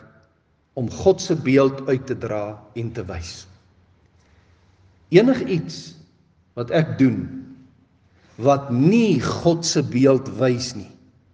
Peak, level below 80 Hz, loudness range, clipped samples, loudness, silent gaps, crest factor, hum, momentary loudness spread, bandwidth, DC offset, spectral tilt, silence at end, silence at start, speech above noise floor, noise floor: 0 dBFS; -56 dBFS; 5 LU; under 0.1%; -20 LUFS; none; 20 dB; none; 18 LU; 9.8 kHz; under 0.1%; -6 dB/octave; 0.45 s; 0.75 s; 43 dB; -63 dBFS